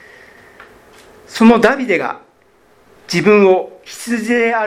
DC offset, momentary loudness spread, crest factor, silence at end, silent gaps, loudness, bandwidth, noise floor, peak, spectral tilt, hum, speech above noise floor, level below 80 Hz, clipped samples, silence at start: under 0.1%; 19 LU; 16 dB; 0 s; none; -13 LUFS; 15 kHz; -52 dBFS; 0 dBFS; -5.5 dB/octave; none; 39 dB; -54 dBFS; under 0.1%; 1.3 s